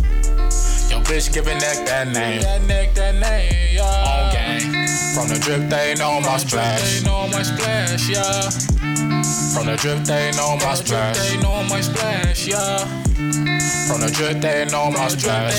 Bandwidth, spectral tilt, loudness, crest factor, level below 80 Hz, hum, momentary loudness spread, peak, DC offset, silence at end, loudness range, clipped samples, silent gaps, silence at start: 18.5 kHz; -3.5 dB/octave; -19 LUFS; 12 dB; -22 dBFS; none; 2 LU; -6 dBFS; under 0.1%; 0 s; 1 LU; under 0.1%; none; 0 s